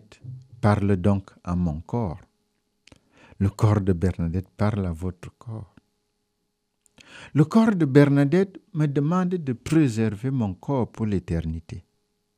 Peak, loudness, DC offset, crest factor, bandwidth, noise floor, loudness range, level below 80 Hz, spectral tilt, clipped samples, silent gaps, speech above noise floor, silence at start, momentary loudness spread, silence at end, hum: -2 dBFS; -23 LUFS; under 0.1%; 22 dB; 11.5 kHz; -75 dBFS; 6 LU; -46 dBFS; -8.5 dB/octave; under 0.1%; none; 53 dB; 0.25 s; 20 LU; 0.55 s; none